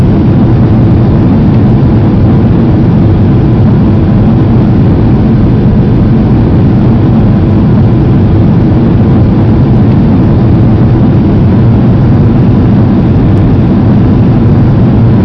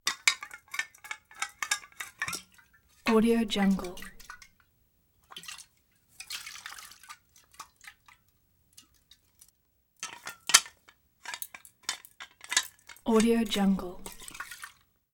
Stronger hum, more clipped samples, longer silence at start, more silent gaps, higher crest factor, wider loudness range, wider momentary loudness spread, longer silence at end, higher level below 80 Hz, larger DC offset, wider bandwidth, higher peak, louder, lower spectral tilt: neither; first, 3% vs under 0.1%; about the same, 0 s vs 0.05 s; neither; second, 4 dB vs 32 dB; second, 0 LU vs 16 LU; second, 1 LU vs 24 LU; second, 0 s vs 0.45 s; first, -16 dBFS vs -58 dBFS; neither; second, 5.6 kHz vs 19.5 kHz; about the same, 0 dBFS vs 0 dBFS; first, -6 LUFS vs -30 LUFS; first, -11 dB/octave vs -3 dB/octave